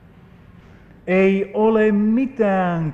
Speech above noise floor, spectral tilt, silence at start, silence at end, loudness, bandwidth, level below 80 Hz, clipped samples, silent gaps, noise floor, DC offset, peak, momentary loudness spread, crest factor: 29 dB; -9 dB/octave; 1.05 s; 0 s; -18 LUFS; 7 kHz; -50 dBFS; under 0.1%; none; -46 dBFS; under 0.1%; -6 dBFS; 4 LU; 14 dB